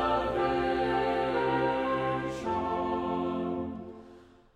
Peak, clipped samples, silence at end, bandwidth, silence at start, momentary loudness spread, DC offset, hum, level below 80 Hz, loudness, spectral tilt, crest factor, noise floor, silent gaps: -16 dBFS; under 0.1%; 0.35 s; 10.5 kHz; 0 s; 8 LU; under 0.1%; none; -52 dBFS; -30 LUFS; -6.5 dB/octave; 14 dB; -54 dBFS; none